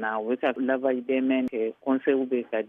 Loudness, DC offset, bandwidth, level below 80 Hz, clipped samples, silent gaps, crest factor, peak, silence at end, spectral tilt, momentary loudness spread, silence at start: -26 LUFS; under 0.1%; 3.7 kHz; -74 dBFS; under 0.1%; none; 16 dB; -10 dBFS; 0 s; -7.5 dB/octave; 4 LU; 0 s